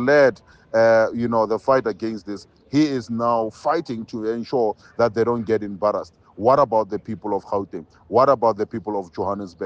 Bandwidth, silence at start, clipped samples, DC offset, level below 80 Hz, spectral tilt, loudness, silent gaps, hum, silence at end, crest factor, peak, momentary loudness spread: 8 kHz; 0 s; under 0.1%; under 0.1%; -58 dBFS; -6.5 dB/octave; -21 LUFS; none; none; 0 s; 16 dB; -4 dBFS; 12 LU